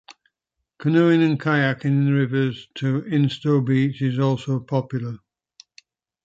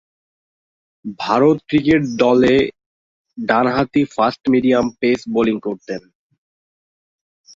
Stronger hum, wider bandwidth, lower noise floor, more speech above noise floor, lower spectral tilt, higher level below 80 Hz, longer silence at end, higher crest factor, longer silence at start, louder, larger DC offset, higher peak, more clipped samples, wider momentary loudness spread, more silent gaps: neither; about the same, 7.8 kHz vs 7.6 kHz; second, -81 dBFS vs under -90 dBFS; second, 60 dB vs over 74 dB; first, -8 dB/octave vs -6.5 dB/octave; second, -64 dBFS vs -50 dBFS; second, 1.1 s vs 1.55 s; about the same, 16 dB vs 18 dB; second, 0.8 s vs 1.05 s; second, -21 LUFS vs -17 LUFS; neither; second, -6 dBFS vs 0 dBFS; neither; second, 10 LU vs 13 LU; second, none vs 2.86-3.25 s